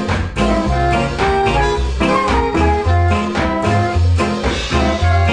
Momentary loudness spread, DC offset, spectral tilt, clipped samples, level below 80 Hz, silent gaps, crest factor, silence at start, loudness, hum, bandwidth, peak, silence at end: 3 LU; 0.3%; -6 dB/octave; under 0.1%; -22 dBFS; none; 14 dB; 0 s; -16 LUFS; none; 10 kHz; -2 dBFS; 0 s